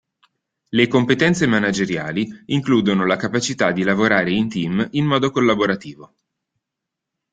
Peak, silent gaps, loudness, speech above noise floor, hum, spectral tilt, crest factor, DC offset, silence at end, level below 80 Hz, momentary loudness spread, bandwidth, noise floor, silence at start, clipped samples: -2 dBFS; none; -18 LUFS; 64 dB; none; -5.5 dB/octave; 18 dB; under 0.1%; 1.25 s; -56 dBFS; 7 LU; 9.2 kHz; -82 dBFS; 0.7 s; under 0.1%